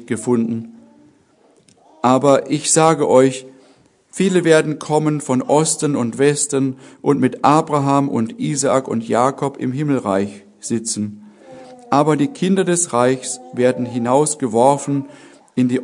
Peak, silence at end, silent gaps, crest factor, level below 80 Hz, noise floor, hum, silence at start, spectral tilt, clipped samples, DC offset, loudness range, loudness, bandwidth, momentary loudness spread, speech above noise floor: 0 dBFS; 0 s; none; 18 dB; -64 dBFS; -54 dBFS; none; 0 s; -5 dB/octave; under 0.1%; under 0.1%; 4 LU; -17 LUFS; 11 kHz; 10 LU; 38 dB